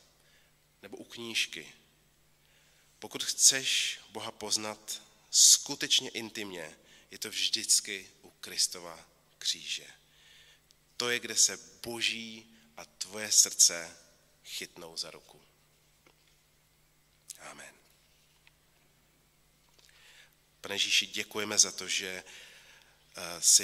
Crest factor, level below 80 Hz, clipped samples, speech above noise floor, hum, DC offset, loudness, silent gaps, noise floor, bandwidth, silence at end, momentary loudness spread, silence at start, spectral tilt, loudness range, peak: 28 dB; -74 dBFS; under 0.1%; 36 dB; none; under 0.1%; -27 LUFS; none; -67 dBFS; 16 kHz; 0 s; 24 LU; 0.85 s; 1 dB/octave; 14 LU; -6 dBFS